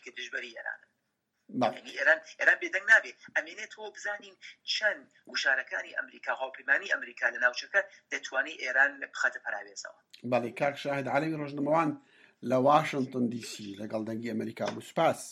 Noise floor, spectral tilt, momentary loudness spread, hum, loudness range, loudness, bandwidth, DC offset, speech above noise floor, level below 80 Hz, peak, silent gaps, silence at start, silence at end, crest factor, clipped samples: -80 dBFS; -4 dB/octave; 16 LU; none; 4 LU; -30 LUFS; 14.5 kHz; under 0.1%; 49 dB; -84 dBFS; -8 dBFS; none; 0.05 s; 0 s; 22 dB; under 0.1%